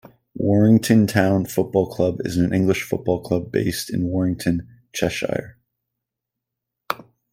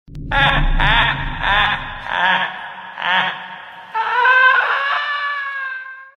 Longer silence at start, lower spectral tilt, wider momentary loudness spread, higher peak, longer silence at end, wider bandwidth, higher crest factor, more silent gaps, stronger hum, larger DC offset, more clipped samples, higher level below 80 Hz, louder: first, 0.35 s vs 0.1 s; first, -6.5 dB/octave vs -4.5 dB/octave; about the same, 13 LU vs 15 LU; about the same, 0 dBFS vs 0 dBFS; first, 0.35 s vs 0.1 s; first, 16.5 kHz vs 6.8 kHz; about the same, 20 dB vs 18 dB; neither; neither; neither; neither; second, -52 dBFS vs -28 dBFS; second, -21 LUFS vs -16 LUFS